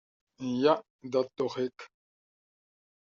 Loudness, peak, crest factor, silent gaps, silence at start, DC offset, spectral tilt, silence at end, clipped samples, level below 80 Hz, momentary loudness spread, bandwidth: -31 LUFS; -12 dBFS; 22 dB; 0.90-0.99 s; 0.4 s; under 0.1%; -4.5 dB/octave; 1.25 s; under 0.1%; -78 dBFS; 11 LU; 7.4 kHz